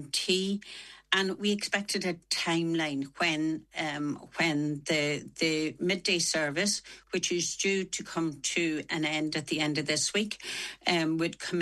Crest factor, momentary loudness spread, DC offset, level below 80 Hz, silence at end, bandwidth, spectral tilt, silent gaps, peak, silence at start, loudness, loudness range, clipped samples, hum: 20 dB; 7 LU; under 0.1%; -68 dBFS; 0 s; 12.5 kHz; -3 dB/octave; none; -10 dBFS; 0 s; -30 LUFS; 1 LU; under 0.1%; none